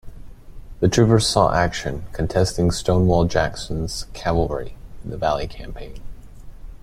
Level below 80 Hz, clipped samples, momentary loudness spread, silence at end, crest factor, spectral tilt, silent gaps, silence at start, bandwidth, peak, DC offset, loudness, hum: -34 dBFS; under 0.1%; 20 LU; 0.05 s; 20 dB; -5.5 dB/octave; none; 0.05 s; 14 kHz; -2 dBFS; under 0.1%; -20 LUFS; none